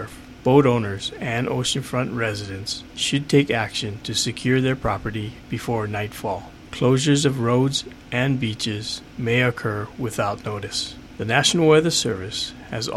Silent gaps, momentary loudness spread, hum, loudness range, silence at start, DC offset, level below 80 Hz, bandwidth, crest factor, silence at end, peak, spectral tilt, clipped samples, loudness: none; 12 LU; none; 3 LU; 0 s; under 0.1%; -48 dBFS; 14.5 kHz; 20 dB; 0 s; -2 dBFS; -4.5 dB/octave; under 0.1%; -22 LUFS